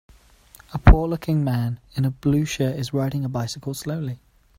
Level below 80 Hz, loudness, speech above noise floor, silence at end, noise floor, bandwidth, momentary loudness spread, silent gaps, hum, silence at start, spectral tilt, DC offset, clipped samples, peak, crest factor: -26 dBFS; -23 LUFS; 27 dB; 0.4 s; -51 dBFS; 16 kHz; 13 LU; none; none; 0.7 s; -6.5 dB/octave; under 0.1%; under 0.1%; 0 dBFS; 22 dB